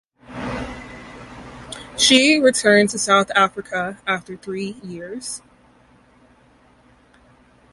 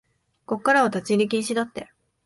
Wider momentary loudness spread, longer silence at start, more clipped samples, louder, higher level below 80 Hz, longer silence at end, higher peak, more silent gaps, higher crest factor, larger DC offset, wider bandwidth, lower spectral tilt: first, 24 LU vs 12 LU; second, 0.3 s vs 0.5 s; neither; first, -18 LUFS vs -23 LUFS; first, -50 dBFS vs -66 dBFS; first, 2.35 s vs 0.4 s; first, 0 dBFS vs -6 dBFS; neither; about the same, 22 dB vs 18 dB; neither; about the same, 11.5 kHz vs 11.5 kHz; second, -2.5 dB/octave vs -4.5 dB/octave